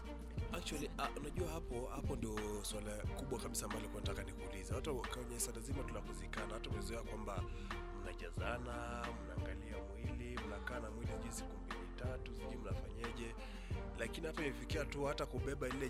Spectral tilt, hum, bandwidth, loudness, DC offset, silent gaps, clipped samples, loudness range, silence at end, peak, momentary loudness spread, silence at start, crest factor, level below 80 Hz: -5 dB/octave; none; 16 kHz; -45 LUFS; under 0.1%; none; under 0.1%; 3 LU; 0 s; -26 dBFS; 6 LU; 0 s; 18 dB; -50 dBFS